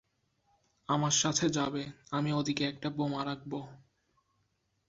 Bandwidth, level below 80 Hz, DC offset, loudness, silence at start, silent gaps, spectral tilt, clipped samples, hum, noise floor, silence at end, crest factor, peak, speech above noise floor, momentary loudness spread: 8 kHz; -68 dBFS; under 0.1%; -32 LUFS; 0.9 s; none; -4 dB/octave; under 0.1%; none; -77 dBFS; 1.1 s; 20 dB; -14 dBFS; 45 dB; 14 LU